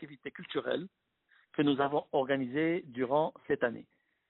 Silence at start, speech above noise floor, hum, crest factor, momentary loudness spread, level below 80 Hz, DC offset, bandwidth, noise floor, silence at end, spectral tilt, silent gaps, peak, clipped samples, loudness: 0 s; 38 dB; none; 18 dB; 13 LU; -74 dBFS; under 0.1%; 4.1 kHz; -70 dBFS; 0.5 s; -4 dB/octave; none; -16 dBFS; under 0.1%; -33 LUFS